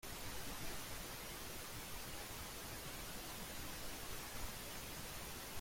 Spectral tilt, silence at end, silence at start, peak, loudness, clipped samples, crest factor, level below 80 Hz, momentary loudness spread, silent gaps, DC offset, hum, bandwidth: -2.5 dB/octave; 0 s; 0.05 s; -32 dBFS; -48 LUFS; under 0.1%; 16 dB; -56 dBFS; 1 LU; none; under 0.1%; none; 16.5 kHz